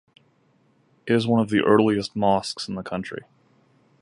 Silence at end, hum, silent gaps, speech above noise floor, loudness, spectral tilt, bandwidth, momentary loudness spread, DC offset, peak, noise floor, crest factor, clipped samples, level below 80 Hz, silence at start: 0.85 s; none; none; 41 dB; -22 LUFS; -6 dB/octave; 11.5 kHz; 15 LU; under 0.1%; -4 dBFS; -63 dBFS; 20 dB; under 0.1%; -58 dBFS; 1.05 s